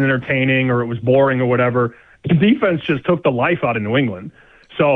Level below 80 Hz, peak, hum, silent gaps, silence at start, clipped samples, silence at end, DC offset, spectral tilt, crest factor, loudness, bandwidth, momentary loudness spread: -52 dBFS; -4 dBFS; none; none; 0 s; under 0.1%; 0 s; under 0.1%; -9.5 dB/octave; 12 dB; -17 LUFS; 4.2 kHz; 8 LU